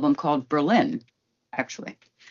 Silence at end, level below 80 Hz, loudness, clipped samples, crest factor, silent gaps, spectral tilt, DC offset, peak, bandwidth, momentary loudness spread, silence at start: 0.4 s; -74 dBFS; -25 LUFS; under 0.1%; 18 dB; none; -4.5 dB/octave; under 0.1%; -6 dBFS; 7.2 kHz; 15 LU; 0 s